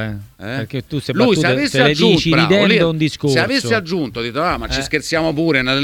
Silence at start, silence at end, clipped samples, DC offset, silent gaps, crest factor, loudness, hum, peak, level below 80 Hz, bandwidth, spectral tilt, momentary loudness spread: 0 s; 0 s; under 0.1%; under 0.1%; none; 16 dB; -16 LUFS; none; 0 dBFS; -40 dBFS; 17.5 kHz; -5 dB/octave; 12 LU